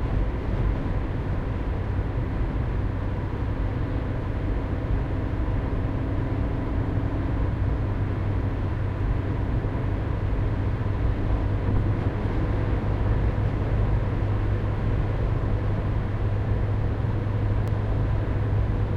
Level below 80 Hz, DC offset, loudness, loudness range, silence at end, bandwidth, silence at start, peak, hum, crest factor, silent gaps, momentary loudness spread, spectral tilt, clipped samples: -28 dBFS; under 0.1%; -27 LUFS; 3 LU; 0 s; 5.2 kHz; 0 s; -12 dBFS; none; 12 dB; none; 3 LU; -9.5 dB/octave; under 0.1%